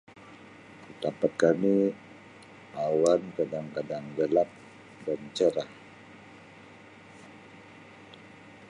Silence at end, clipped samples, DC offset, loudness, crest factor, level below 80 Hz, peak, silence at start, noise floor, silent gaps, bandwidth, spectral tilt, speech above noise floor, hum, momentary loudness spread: 0.05 s; under 0.1%; under 0.1%; -28 LUFS; 22 dB; -72 dBFS; -8 dBFS; 0.15 s; -51 dBFS; none; 11.5 kHz; -6 dB/octave; 24 dB; none; 25 LU